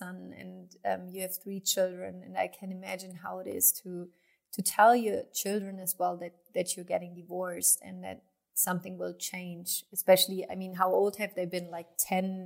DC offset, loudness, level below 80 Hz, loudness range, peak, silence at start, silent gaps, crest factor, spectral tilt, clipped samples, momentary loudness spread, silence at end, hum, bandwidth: under 0.1%; -30 LUFS; -82 dBFS; 3 LU; -10 dBFS; 0 s; none; 22 dB; -3 dB/octave; under 0.1%; 18 LU; 0 s; none; 16 kHz